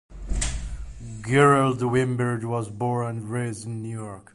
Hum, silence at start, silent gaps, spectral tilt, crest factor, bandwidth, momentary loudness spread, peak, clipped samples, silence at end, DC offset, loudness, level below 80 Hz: none; 0.1 s; none; -6 dB/octave; 18 dB; 11.5 kHz; 18 LU; -6 dBFS; under 0.1%; 0.15 s; under 0.1%; -24 LUFS; -38 dBFS